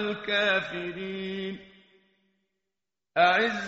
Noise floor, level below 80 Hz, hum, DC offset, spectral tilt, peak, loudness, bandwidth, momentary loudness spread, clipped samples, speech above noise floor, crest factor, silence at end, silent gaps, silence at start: -88 dBFS; -66 dBFS; none; under 0.1%; -1.5 dB/octave; -8 dBFS; -27 LUFS; 7.6 kHz; 13 LU; under 0.1%; 61 dB; 22 dB; 0 s; none; 0 s